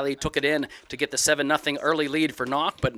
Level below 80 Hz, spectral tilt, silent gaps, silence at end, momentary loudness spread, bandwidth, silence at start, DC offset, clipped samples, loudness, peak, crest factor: -50 dBFS; -3 dB/octave; none; 0 s; 6 LU; 16 kHz; 0 s; under 0.1%; under 0.1%; -24 LUFS; -6 dBFS; 18 dB